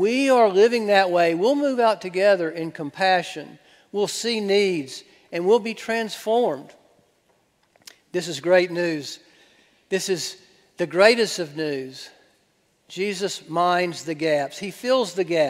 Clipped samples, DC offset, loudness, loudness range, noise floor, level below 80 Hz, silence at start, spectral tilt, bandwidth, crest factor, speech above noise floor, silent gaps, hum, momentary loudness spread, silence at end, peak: under 0.1%; under 0.1%; -22 LUFS; 5 LU; -65 dBFS; -74 dBFS; 0 s; -4 dB/octave; 16 kHz; 22 dB; 44 dB; none; none; 15 LU; 0 s; 0 dBFS